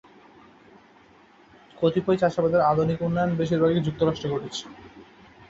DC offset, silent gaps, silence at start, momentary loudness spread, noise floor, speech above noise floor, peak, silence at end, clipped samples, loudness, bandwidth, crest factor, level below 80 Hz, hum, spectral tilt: under 0.1%; none; 1.8 s; 9 LU; -54 dBFS; 31 dB; -8 dBFS; 0.45 s; under 0.1%; -24 LUFS; 7.8 kHz; 18 dB; -54 dBFS; none; -7 dB/octave